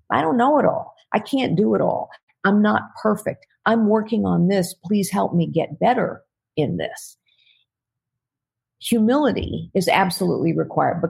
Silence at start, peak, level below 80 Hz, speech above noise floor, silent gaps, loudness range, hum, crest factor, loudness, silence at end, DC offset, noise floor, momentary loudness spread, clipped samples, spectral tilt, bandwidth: 0.1 s; -2 dBFS; -50 dBFS; 66 dB; 2.23-2.27 s; 5 LU; none; 18 dB; -20 LUFS; 0 s; under 0.1%; -86 dBFS; 10 LU; under 0.1%; -6 dB/octave; 16 kHz